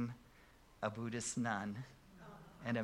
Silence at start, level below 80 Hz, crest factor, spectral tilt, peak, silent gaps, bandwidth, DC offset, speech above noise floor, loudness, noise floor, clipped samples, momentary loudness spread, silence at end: 0 s; -70 dBFS; 20 dB; -4.5 dB/octave; -24 dBFS; none; 15.5 kHz; under 0.1%; 23 dB; -42 LUFS; -64 dBFS; under 0.1%; 18 LU; 0 s